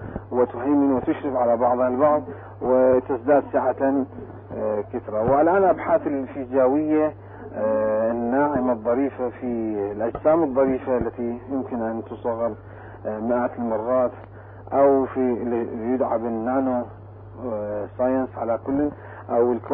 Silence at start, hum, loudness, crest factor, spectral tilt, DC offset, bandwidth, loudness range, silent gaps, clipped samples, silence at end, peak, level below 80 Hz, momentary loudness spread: 0 s; none; -23 LUFS; 14 dB; -12.5 dB/octave; under 0.1%; 3.7 kHz; 5 LU; none; under 0.1%; 0 s; -8 dBFS; -50 dBFS; 11 LU